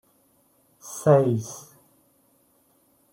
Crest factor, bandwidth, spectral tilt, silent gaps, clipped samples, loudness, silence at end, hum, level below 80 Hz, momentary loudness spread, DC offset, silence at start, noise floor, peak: 22 dB; 16.5 kHz; -7 dB/octave; none; under 0.1%; -22 LUFS; 1.55 s; none; -68 dBFS; 23 LU; under 0.1%; 0.85 s; -64 dBFS; -4 dBFS